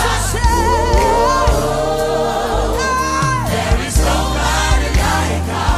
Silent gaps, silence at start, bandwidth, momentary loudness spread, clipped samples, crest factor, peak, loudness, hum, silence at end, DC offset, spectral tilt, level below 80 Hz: none; 0 s; 15.5 kHz; 4 LU; under 0.1%; 12 dB; -2 dBFS; -15 LUFS; none; 0 s; under 0.1%; -4.5 dB/octave; -20 dBFS